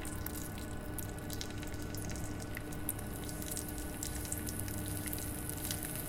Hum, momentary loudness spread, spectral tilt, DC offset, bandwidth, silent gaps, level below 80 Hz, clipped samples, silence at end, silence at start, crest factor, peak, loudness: none; 4 LU; -4 dB/octave; under 0.1%; 17 kHz; none; -48 dBFS; under 0.1%; 0 s; 0 s; 22 dB; -18 dBFS; -40 LUFS